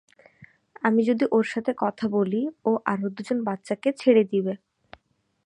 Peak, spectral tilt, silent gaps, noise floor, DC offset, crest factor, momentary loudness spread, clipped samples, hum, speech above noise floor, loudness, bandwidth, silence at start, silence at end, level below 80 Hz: -6 dBFS; -7 dB/octave; none; -68 dBFS; under 0.1%; 20 dB; 8 LU; under 0.1%; none; 44 dB; -24 LUFS; 10.5 kHz; 0.4 s; 0.9 s; -72 dBFS